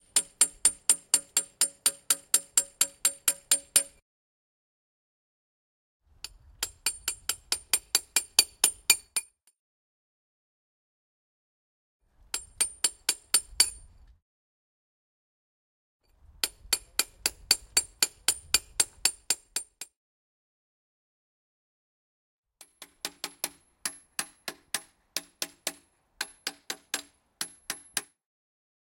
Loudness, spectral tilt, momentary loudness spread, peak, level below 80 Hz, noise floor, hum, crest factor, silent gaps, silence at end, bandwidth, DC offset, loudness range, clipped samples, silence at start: -27 LUFS; 2 dB/octave; 15 LU; 0 dBFS; -62 dBFS; -57 dBFS; none; 34 dB; 4.02-6.00 s, 9.59-12.00 s, 14.22-16.00 s, 19.96-22.43 s; 0.95 s; 16.5 kHz; under 0.1%; 13 LU; under 0.1%; 0.15 s